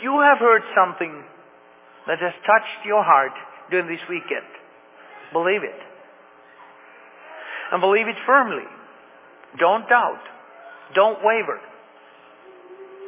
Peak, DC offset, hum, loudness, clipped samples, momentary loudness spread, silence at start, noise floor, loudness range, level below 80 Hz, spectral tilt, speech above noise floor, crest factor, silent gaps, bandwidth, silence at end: -2 dBFS; under 0.1%; none; -20 LUFS; under 0.1%; 21 LU; 0 s; -50 dBFS; 8 LU; -88 dBFS; -7.5 dB/octave; 30 dB; 20 dB; none; 3.9 kHz; 0 s